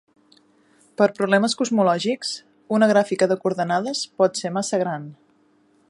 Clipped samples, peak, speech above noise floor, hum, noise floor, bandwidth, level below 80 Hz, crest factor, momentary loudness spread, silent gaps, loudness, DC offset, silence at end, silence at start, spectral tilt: under 0.1%; -4 dBFS; 39 dB; none; -60 dBFS; 11.5 kHz; -72 dBFS; 18 dB; 11 LU; none; -21 LUFS; under 0.1%; 0.75 s; 1 s; -4.5 dB/octave